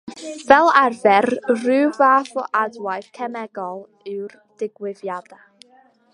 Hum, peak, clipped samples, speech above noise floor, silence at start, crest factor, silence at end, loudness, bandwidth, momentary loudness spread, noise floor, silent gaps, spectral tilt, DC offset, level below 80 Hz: none; 0 dBFS; under 0.1%; 35 dB; 0.05 s; 20 dB; 0.95 s; -18 LUFS; 11.5 kHz; 18 LU; -54 dBFS; none; -4.5 dB/octave; under 0.1%; -64 dBFS